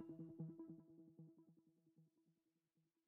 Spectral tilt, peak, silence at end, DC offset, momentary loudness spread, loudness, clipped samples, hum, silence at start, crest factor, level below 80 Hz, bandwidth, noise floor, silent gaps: -12 dB/octave; -42 dBFS; 0.25 s; under 0.1%; 12 LU; -59 LUFS; under 0.1%; none; 0 s; 20 dB; under -90 dBFS; 2.8 kHz; -88 dBFS; none